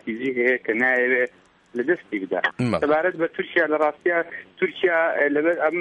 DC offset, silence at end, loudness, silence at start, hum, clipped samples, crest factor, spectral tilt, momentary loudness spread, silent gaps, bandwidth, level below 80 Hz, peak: under 0.1%; 0 s; -22 LUFS; 0.05 s; none; under 0.1%; 16 dB; -6.5 dB/octave; 7 LU; none; 10 kHz; -64 dBFS; -6 dBFS